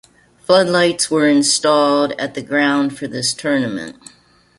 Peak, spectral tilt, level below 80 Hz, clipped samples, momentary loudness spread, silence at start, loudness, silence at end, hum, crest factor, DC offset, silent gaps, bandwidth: -2 dBFS; -3.5 dB/octave; -58 dBFS; under 0.1%; 11 LU; 0.5 s; -16 LUFS; 0.65 s; none; 16 dB; under 0.1%; none; 11.5 kHz